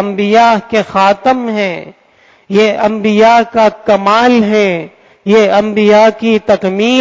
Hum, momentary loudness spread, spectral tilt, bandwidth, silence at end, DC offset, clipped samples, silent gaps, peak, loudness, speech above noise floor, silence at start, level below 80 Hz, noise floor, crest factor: none; 8 LU; -5.5 dB/octave; 7.6 kHz; 0 s; under 0.1%; under 0.1%; none; 0 dBFS; -10 LUFS; 37 dB; 0 s; -50 dBFS; -47 dBFS; 10 dB